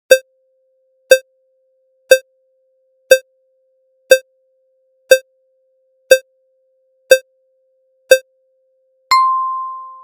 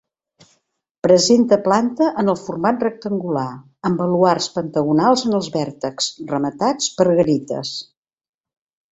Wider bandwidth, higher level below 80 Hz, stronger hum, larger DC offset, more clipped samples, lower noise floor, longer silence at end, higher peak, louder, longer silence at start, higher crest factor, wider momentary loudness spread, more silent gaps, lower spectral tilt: first, 17 kHz vs 8.2 kHz; second, -70 dBFS vs -58 dBFS; neither; neither; first, 0.1% vs under 0.1%; second, -61 dBFS vs -70 dBFS; second, 0.15 s vs 1.05 s; about the same, 0 dBFS vs 0 dBFS; first, -14 LUFS vs -18 LUFS; second, 0.1 s vs 1.05 s; about the same, 18 dB vs 18 dB; second, 2 LU vs 10 LU; neither; second, 1.5 dB/octave vs -5 dB/octave